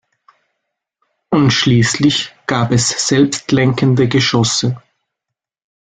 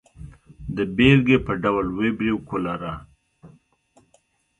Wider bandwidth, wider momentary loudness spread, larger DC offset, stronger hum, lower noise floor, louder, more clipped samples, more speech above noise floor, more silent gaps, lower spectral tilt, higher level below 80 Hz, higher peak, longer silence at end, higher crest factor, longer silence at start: about the same, 9.6 kHz vs 9.6 kHz; second, 7 LU vs 17 LU; neither; neither; first, -81 dBFS vs -64 dBFS; first, -14 LUFS vs -21 LUFS; neither; first, 68 dB vs 43 dB; neither; second, -4.5 dB/octave vs -8 dB/octave; about the same, -46 dBFS vs -44 dBFS; about the same, 0 dBFS vs -2 dBFS; about the same, 1.05 s vs 1.1 s; about the same, 16 dB vs 20 dB; first, 1.3 s vs 0.2 s